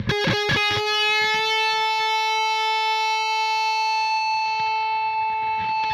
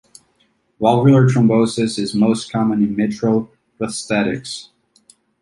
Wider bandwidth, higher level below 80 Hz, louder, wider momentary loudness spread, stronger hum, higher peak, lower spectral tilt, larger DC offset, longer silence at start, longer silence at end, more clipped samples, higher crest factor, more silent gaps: first, 15 kHz vs 11.5 kHz; about the same, -54 dBFS vs -54 dBFS; second, -21 LUFS vs -17 LUFS; second, 4 LU vs 14 LU; neither; second, -10 dBFS vs -2 dBFS; second, -2.5 dB/octave vs -6.5 dB/octave; neither; second, 0 s vs 0.8 s; second, 0 s vs 0.8 s; neither; about the same, 12 dB vs 16 dB; neither